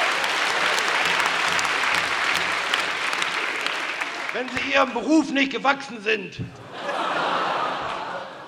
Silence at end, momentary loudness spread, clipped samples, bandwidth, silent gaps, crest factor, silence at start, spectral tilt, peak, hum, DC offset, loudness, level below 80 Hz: 0 s; 8 LU; under 0.1%; 18 kHz; none; 20 dB; 0 s; -2.5 dB/octave; -4 dBFS; none; under 0.1%; -22 LUFS; -62 dBFS